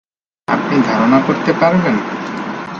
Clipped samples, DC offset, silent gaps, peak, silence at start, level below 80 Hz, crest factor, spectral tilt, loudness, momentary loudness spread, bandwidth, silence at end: under 0.1%; under 0.1%; none; 0 dBFS; 0.5 s; -54 dBFS; 14 dB; -7 dB/octave; -15 LUFS; 11 LU; 7.4 kHz; 0 s